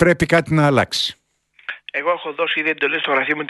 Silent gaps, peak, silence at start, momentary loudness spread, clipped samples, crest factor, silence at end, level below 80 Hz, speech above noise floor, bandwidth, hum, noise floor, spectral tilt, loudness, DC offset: none; 0 dBFS; 0 s; 12 LU; under 0.1%; 18 dB; 0 s; -46 dBFS; 23 dB; 12 kHz; none; -41 dBFS; -5 dB/octave; -18 LUFS; under 0.1%